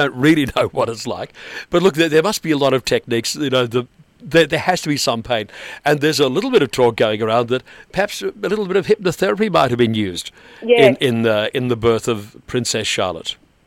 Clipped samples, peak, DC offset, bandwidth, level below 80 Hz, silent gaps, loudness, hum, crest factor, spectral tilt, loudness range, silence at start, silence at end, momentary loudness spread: under 0.1%; 0 dBFS; under 0.1%; 16.5 kHz; -50 dBFS; none; -17 LUFS; none; 18 dB; -4.5 dB/octave; 2 LU; 0 s; 0.3 s; 11 LU